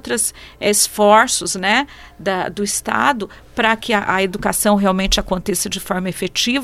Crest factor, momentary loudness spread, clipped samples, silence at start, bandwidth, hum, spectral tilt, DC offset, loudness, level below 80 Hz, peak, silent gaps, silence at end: 18 dB; 9 LU; under 0.1%; 0.05 s; 16 kHz; none; -2.5 dB/octave; under 0.1%; -17 LUFS; -36 dBFS; 0 dBFS; none; 0 s